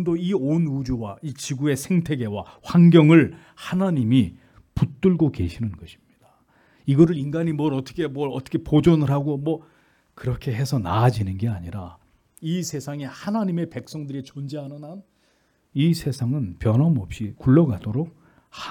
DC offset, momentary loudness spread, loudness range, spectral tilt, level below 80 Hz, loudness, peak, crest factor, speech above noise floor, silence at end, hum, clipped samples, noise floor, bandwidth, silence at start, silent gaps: under 0.1%; 15 LU; 10 LU; -7.5 dB/octave; -48 dBFS; -22 LUFS; -2 dBFS; 20 dB; 43 dB; 0 s; none; under 0.1%; -64 dBFS; 14.5 kHz; 0 s; none